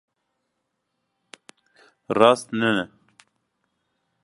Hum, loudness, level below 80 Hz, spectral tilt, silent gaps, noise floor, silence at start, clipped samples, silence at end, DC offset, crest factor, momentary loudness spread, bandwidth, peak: none; -20 LUFS; -68 dBFS; -5 dB/octave; none; -77 dBFS; 2.1 s; under 0.1%; 1.35 s; under 0.1%; 26 dB; 11 LU; 11.5 kHz; 0 dBFS